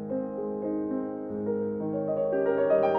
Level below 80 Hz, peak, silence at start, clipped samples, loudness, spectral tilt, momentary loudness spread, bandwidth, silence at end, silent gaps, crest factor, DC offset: -66 dBFS; -14 dBFS; 0 s; under 0.1%; -29 LUFS; -10 dB/octave; 8 LU; 5.2 kHz; 0 s; none; 14 dB; under 0.1%